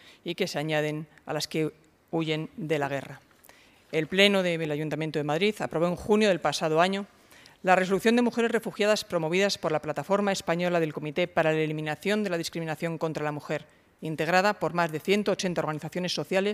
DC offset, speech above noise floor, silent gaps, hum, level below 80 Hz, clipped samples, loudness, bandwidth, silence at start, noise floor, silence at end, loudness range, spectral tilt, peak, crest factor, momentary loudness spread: under 0.1%; 29 dB; none; none; -64 dBFS; under 0.1%; -27 LUFS; 15.5 kHz; 0.05 s; -56 dBFS; 0 s; 4 LU; -5 dB/octave; -6 dBFS; 22 dB; 9 LU